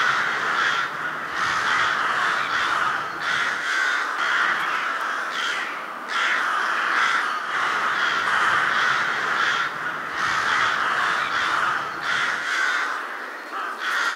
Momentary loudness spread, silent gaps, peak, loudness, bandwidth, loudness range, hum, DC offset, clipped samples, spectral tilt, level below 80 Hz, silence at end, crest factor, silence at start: 7 LU; none; -8 dBFS; -22 LUFS; 16 kHz; 2 LU; none; under 0.1%; under 0.1%; -1 dB/octave; -66 dBFS; 0 s; 14 dB; 0 s